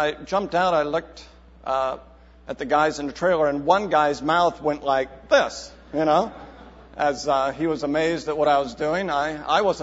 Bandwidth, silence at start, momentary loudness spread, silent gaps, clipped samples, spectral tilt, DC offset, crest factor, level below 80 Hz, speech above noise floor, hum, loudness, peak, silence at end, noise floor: 8 kHz; 0 s; 11 LU; none; under 0.1%; -4.5 dB/octave; under 0.1%; 18 dB; -50 dBFS; 22 dB; none; -22 LUFS; -4 dBFS; 0 s; -44 dBFS